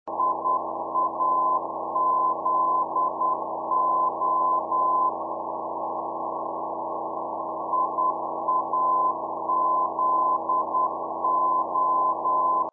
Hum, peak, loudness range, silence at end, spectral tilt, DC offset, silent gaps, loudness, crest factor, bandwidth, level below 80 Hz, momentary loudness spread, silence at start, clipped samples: none; -14 dBFS; 4 LU; 0 s; 8 dB/octave; under 0.1%; none; -25 LUFS; 12 dB; 1.3 kHz; -78 dBFS; 8 LU; 0.05 s; under 0.1%